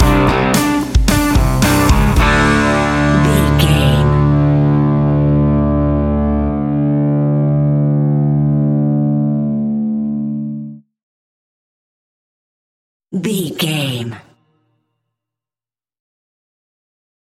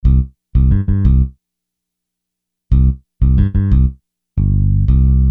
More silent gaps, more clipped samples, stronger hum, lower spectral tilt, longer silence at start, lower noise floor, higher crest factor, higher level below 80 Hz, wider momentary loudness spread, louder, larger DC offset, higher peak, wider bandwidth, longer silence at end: first, 11.03-13.00 s vs none; neither; second, none vs 60 Hz at -35 dBFS; second, -6 dB/octave vs -12 dB/octave; about the same, 0 s vs 0.05 s; first, under -90 dBFS vs -79 dBFS; about the same, 14 dB vs 12 dB; second, -24 dBFS vs -16 dBFS; about the same, 8 LU vs 6 LU; about the same, -14 LUFS vs -15 LUFS; neither; about the same, 0 dBFS vs -2 dBFS; first, 17 kHz vs 2.5 kHz; first, 3.1 s vs 0 s